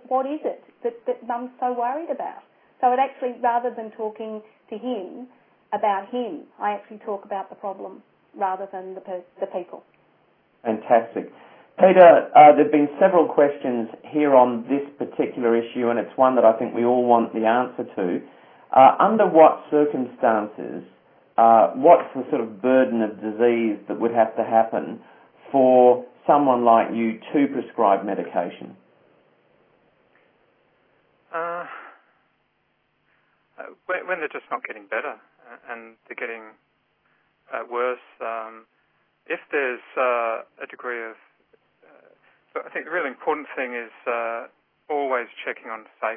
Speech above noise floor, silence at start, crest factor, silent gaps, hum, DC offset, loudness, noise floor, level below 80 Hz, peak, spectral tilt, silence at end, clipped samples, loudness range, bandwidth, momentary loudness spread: 49 dB; 0.1 s; 22 dB; none; none; under 0.1%; -21 LUFS; -69 dBFS; -84 dBFS; 0 dBFS; -10 dB/octave; 0 s; under 0.1%; 17 LU; 3.6 kHz; 19 LU